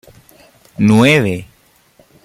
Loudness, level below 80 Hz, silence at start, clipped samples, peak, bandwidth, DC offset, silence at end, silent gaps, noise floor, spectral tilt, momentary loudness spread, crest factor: -12 LUFS; -50 dBFS; 0.8 s; under 0.1%; 0 dBFS; 15 kHz; under 0.1%; 0.8 s; none; -51 dBFS; -6 dB/octave; 18 LU; 16 dB